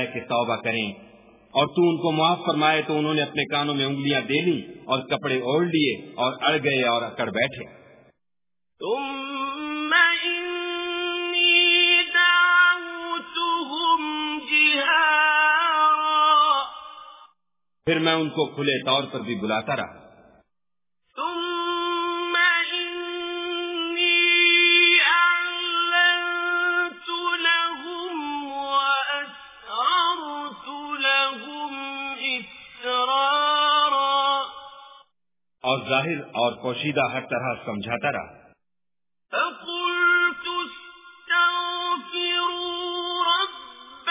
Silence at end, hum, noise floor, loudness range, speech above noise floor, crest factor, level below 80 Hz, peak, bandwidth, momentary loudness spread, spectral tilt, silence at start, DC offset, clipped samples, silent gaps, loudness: 0 s; none; under -90 dBFS; 8 LU; over 66 dB; 18 dB; -68 dBFS; -4 dBFS; 3.9 kHz; 14 LU; -0.5 dB/octave; 0 s; under 0.1%; under 0.1%; none; -21 LUFS